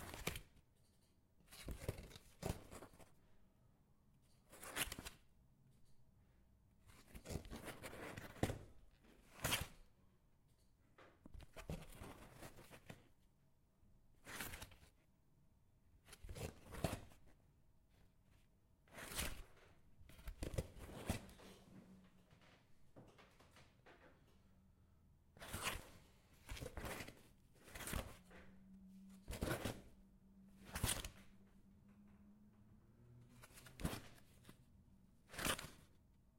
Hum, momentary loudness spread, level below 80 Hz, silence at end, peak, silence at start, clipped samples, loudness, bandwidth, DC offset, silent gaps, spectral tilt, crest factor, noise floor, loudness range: none; 23 LU; -62 dBFS; 0.05 s; -22 dBFS; 0 s; under 0.1%; -49 LUFS; 16.5 kHz; under 0.1%; none; -3.5 dB/octave; 32 dB; -75 dBFS; 9 LU